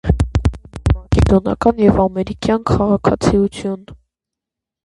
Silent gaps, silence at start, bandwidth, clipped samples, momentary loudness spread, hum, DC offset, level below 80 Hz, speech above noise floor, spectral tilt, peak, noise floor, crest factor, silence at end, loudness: none; 0.05 s; 11.5 kHz; under 0.1%; 9 LU; none; under 0.1%; -24 dBFS; 69 dB; -7.5 dB/octave; 0 dBFS; -84 dBFS; 16 dB; 0.9 s; -16 LUFS